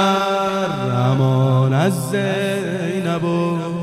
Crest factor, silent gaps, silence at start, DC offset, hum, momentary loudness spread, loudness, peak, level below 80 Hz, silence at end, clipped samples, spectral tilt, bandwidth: 16 dB; none; 0 s; under 0.1%; none; 6 LU; -18 LUFS; -2 dBFS; -56 dBFS; 0 s; under 0.1%; -6.5 dB/octave; 13.5 kHz